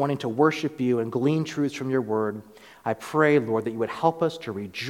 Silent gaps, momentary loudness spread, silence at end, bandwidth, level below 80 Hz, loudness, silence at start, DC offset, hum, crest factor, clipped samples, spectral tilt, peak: none; 10 LU; 0 s; 16 kHz; -68 dBFS; -25 LUFS; 0 s; under 0.1%; none; 18 dB; under 0.1%; -6.5 dB/octave; -6 dBFS